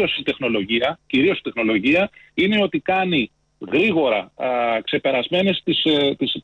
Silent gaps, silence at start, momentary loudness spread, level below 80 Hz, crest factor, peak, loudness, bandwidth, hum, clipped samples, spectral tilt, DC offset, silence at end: none; 0 s; 5 LU; -56 dBFS; 12 dB; -8 dBFS; -20 LUFS; 8.2 kHz; none; under 0.1%; -6.5 dB/octave; under 0.1%; 0 s